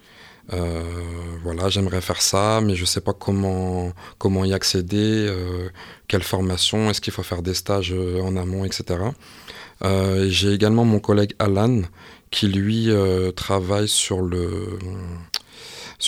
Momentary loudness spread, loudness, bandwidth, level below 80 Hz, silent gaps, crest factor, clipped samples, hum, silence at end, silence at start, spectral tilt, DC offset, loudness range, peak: 13 LU; -22 LUFS; 16.5 kHz; -44 dBFS; none; 18 dB; under 0.1%; none; 0 s; 0.2 s; -5 dB/octave; under 0.1%; 3 LU; -4 dBFS